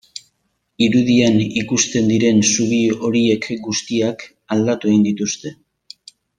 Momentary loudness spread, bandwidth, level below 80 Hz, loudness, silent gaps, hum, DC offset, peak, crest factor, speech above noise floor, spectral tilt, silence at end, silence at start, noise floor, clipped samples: 10 LU; 10 kHz; -56 dBFS; -17 LUFS; none; none; under 0.1%; -2 dBFS; 16 dB; 52 dB; -4.5 dB/octave; 0.85 s; 0.8 s; -69 dBFS; under 0.1%